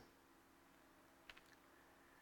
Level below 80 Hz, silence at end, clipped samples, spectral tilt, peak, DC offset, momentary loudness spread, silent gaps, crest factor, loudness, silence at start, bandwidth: -82 dBFS; 0 s; under 0.1%; -3 dB/octave; -40 dBFS; under 0.1%; 7 LU; none; 28 dB; -67 LUFS; 0 s; 18 kHz